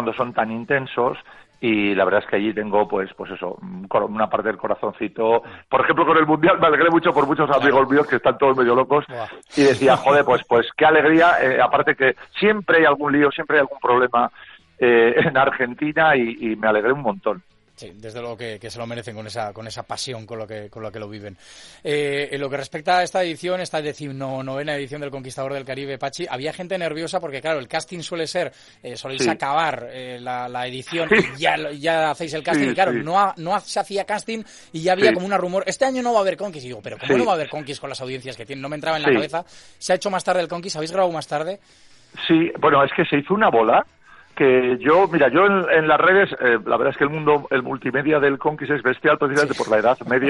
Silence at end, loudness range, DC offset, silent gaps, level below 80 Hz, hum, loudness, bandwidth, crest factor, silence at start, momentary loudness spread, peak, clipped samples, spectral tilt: 0 s; 10 LU; under 0.1%; none; -58 dBFS; none; -19 LUFS; 11.5 kHz; 18 dB; 0 s; 15 LU; -2 dBFS; under 0.1%; -5 dB/octave